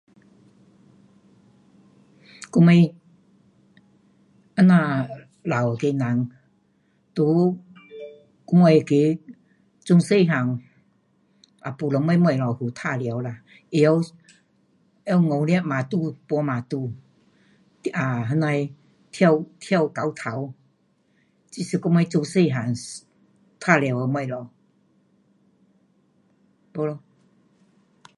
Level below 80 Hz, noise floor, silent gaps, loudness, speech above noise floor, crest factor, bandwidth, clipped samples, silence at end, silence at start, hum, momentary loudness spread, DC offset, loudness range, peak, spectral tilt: -68 dBFS; -65 dBFS; none; -22 LUFS; 44 dB; 22 dB; 11 kHz; under 0.1%; 1.2 s; 2.4 s; none; 19 LU; under 0.1%; 6 LU; -2 dBFS; -7.5 dB/octave